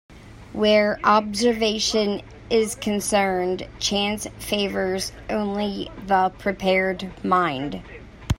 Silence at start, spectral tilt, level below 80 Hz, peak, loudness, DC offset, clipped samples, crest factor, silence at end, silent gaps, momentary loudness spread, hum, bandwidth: 0.1 s; -4 dB/octave; -44 dBFS; -4 dBFS; -22 LUFS; under 0.1%; under 0.1%; 18 dB; 0.05 s; none; 11 LU; none; 16 kHz